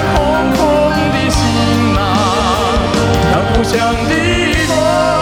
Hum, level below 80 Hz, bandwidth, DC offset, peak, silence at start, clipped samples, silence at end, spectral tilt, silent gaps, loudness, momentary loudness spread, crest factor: none; -24 dBFS; 17 kHz; under 0.1%; -2 dBFS; 0 s; under 0.1%; 0 s; -5 dB/octave; none; -12 LUFS; 1 LU; 10 dB